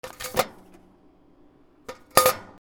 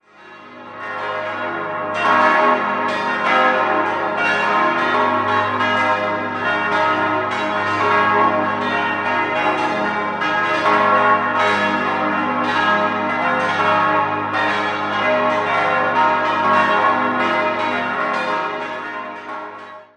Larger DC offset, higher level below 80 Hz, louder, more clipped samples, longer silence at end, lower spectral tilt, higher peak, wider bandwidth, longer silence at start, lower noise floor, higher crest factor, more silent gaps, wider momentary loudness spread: neither; about the same, -58 dBFS vs -60 dBFS; second, -23 LUFS vs -17 LUFS; neither; about the same, 0.15 s vs 0.15 s; second, -2 dB/octave vs -5 dB/octave; about the same, 0 dBFS vs -2 dBFS; first, over 20 kHz vs 10 kHz; second, 0.05 s vs 0.2 s; first, -56 dBFS vs -41 dBFS; first, 28 dB vs 16 dB; neither; first, 24 LU vs 9 LU